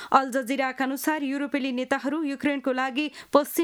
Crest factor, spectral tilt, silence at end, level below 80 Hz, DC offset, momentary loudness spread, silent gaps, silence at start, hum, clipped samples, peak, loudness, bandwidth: 22 dB; -3 dB/octave; 0 s; -70 dBFS; under 0.1%; 5 LU; none; 0 s; none; under 0.1%; -4 dBFS; -26 LUFS; over 20 kHz